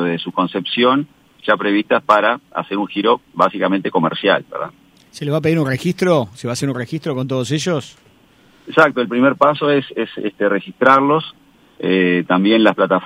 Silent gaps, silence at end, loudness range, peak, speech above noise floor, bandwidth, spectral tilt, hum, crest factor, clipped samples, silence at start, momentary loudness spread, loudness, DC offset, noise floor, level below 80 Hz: none; 0 s; 4 LU; 0 dBFS; 34 dB; 15.5 kHz; -6 dB/octave; none; 16 dB; under 0.1%; 0 s; 10 LU; -17 LUFS; under 0.1%; -51 dBFS; -60 dBFS